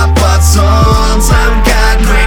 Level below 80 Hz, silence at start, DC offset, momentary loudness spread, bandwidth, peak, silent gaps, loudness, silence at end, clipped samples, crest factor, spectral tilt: -8 dBFS; 0 s; under 0.1%; 2 LU; 18 kHz; 0 dBFS; none; -9 LUFS; 0 s; 1%; 6 dB; -4.5 dB/octave